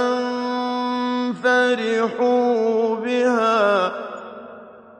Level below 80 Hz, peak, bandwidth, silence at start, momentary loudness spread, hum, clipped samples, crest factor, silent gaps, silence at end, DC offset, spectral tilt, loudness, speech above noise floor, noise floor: -74 dBFS; -6 dBFS; 9.4 kHz; 0 s; 15 LU; none; under 0.1%; 14 dB; none; 0.2 s; under 0.1%; -4.5 dB/octave; -20 LUFS; 23 dB; -41 dBFS